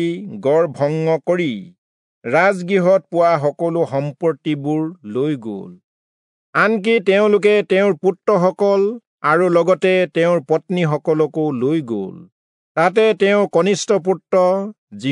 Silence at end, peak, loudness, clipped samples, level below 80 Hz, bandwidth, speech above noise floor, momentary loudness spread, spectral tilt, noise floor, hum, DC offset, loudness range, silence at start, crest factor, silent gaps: 0 s; -2 dBFS; -17 LUFS; under 0.1%; -74 dBFS; 11 kHz; over 74 dB; 8 LU; -6 dB/octave; under -90 dBFS; none; under 0.1%; 4 LU; 0 s; 14 dB; 1.78-2.22 s, 5.84-6.53 s, 9.07-9.18 s, 12.32-12.75 s, 14.78-14.88 s